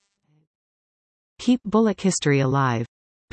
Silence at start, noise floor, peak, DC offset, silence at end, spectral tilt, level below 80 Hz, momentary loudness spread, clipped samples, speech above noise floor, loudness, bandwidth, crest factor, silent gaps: 1.4 s; under -90 dBFS; -8 dBFS; under 0.1%; 0.45 s; -5.5 dB/octave; -60 dBFS; 8 LU; under 0.1%; over 70 dB; -22 LUFS; 8.8 kHz; 16 dB; none